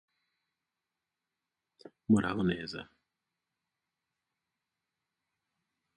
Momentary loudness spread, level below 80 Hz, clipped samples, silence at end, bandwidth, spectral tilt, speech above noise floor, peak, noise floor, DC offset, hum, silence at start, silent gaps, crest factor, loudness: 17 LU; -64 dBFS; under 0.1%; 3.15 s; 9.8 kHz; -6.5 dB/octave; 58 dB; -14 dBFS; -89 dBFS; under 0.1%; none; 2.1 s; none; 26 dB; -31 LUFS